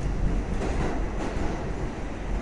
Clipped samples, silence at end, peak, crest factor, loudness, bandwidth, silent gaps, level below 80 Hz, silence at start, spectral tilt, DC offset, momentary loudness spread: under 0.1%; 0 s; -14 dBFS; 14 dB; -31 LUFS; 11 kHz; none; -30 dBFS; 0 s; -6.5 dB/octave; under 0.1%; 4 LU